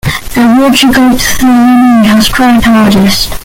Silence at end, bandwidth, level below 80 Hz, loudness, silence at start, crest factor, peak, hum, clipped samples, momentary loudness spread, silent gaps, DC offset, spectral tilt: 0 s; 17 kHz; -24 dBFS; -6 LUFS; 0.05 s; 6 dB; 0 dBFS; none; 0.1%; 3 LU; none; under 0.1%; -4 dB/octave